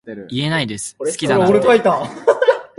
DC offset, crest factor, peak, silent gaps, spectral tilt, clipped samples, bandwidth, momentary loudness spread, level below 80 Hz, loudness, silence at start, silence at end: under 0.1%; 16 dB; 0 dBFS; none; -5 dB/octave; under 0.1%; 11.5 kHz; 11 LU; -56 dBFS; -16 LUFS; 0.05 s; 0.15 s